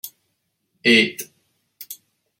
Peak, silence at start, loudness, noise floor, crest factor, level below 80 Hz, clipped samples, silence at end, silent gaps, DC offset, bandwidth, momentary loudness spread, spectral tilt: -2 dBFS; 0.05 s; -17 LUFS; -73 dBFS; 22 dB; -72 dBFS; under 0.1%; 0.45 s; none; under 0.1%; 16.5 kHz; 23 LU; -3 dB/octave